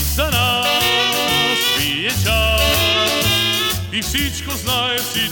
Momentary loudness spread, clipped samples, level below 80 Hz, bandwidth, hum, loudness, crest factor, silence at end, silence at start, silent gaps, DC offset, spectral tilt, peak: 5 LU; under 0.1%; -28 dBFS; over 20 kHz; none; -16 LUFS; 14 dB; 0 s; 0 s; none; 0.1%; -2.5 dB/octave; -4 dBFS